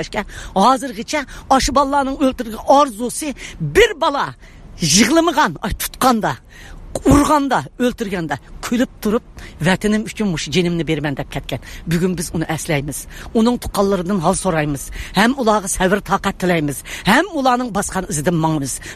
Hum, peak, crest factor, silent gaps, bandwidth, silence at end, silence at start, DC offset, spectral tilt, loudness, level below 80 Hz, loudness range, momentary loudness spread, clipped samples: none; 0 dBFS; 18 dB; none; 15 kHz; 0 s; 0 s; under 0.1%; -4.5 dB/octave; -17 LUFS; -36 dBFS; 4 LU; 11 LU; under 0.1%